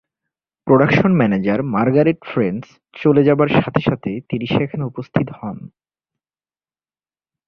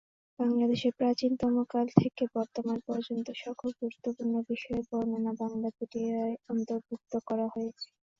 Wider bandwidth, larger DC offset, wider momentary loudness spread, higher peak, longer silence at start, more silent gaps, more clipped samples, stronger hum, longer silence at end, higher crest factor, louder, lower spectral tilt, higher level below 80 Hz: second, 6.4 kHz vs 7.4 kHz; neither; about the same, 12 LU vs 10 LU; about the same, -2 dBFS vs -4 dBFS; first, 0.65 s vs 0.4 s; neither; neither; neither; first, 1.8 s vs 0.35 s; second, 16 dB vs 26 dB; first, -17 LUFS vs -32 LUFS; first, -9 dB/octave vs -7.5 dB/octave; first, -50 dBFS vs -64 dBFS